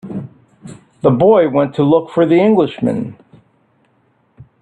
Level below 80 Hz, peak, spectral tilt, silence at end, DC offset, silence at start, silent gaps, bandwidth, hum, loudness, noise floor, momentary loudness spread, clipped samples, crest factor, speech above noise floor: -54 dBFS; 0 dBFS; -9 dB/octave; 0.2 s; under 0.1%; 0.05 s; none; 9.6 kHz; none; -13 LUFS; -58 dBFS; 15 LU; under 0.1%; 14 dB; 46 dB